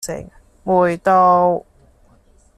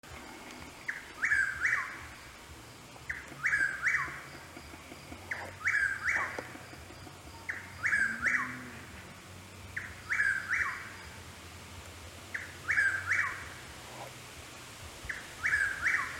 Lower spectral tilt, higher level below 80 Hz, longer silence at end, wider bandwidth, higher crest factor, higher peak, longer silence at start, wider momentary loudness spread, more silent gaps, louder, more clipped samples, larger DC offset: first, -6 dB/octave vs -2.5 dB/octave; first, -50 dBFS vs -58 dBFS; first, 1 s vs 0 s; second, 14 kHz vs 17 kHz; about the same, 16 dB vs 18 dB; first, -2 dBFS vs -16 dBFS; about the same, 0 s vs 0.05 s; about the same, 18 LU vs 19 LU; neither; first, -15 LUFS vs -32 LUFS; neither; neither